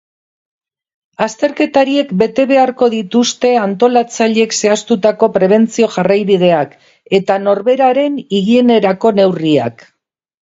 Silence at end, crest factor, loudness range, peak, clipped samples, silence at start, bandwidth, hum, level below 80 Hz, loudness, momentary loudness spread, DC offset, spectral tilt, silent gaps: 0.75 s; 12 dB; 1 LU; 0 dBFS; under 0.1%; 1.2 s; 8 kHz; none; -58 dBFS; -12 LUFS; 5 LU; under 0.1%; -5 dB/octave; none